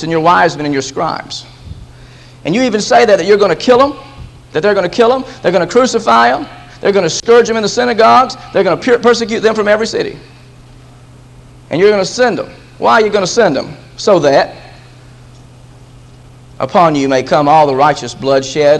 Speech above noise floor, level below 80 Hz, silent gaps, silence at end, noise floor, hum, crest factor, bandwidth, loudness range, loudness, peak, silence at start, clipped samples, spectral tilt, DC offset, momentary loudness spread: 27 dB; -44 dBFS; none; 0 s; -37 dBFS; none; 12 dB; 10.5 kHz; 5 LU; -11 LUFS; 0 dBFS; 0 s; 0.3%; -4.5 dB/octave; under 0.1%; 11 LU